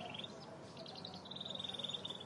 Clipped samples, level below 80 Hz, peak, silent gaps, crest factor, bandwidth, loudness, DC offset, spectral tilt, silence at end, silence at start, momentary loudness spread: under 0.1%; -82 dBFS; -30 dBFS; none; 18 dB; 11.5 kHz; -46 LUFS; under 0.1%; -3.5 dB/octave; 0 s; 0 s; 10 LU